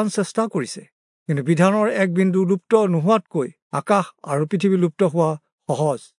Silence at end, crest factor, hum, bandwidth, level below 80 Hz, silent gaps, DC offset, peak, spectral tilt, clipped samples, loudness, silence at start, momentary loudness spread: 0.15 s; 16 dB; none; 11 kHz; -72 dBFS; 0.92-1.26 s, 3.62-3.70 s, 5.52-5.58 s; under 0.1%; -4 dBFS; -7 dB/octave; under 0.1%; -20 LUFS; 0 s; 10 LU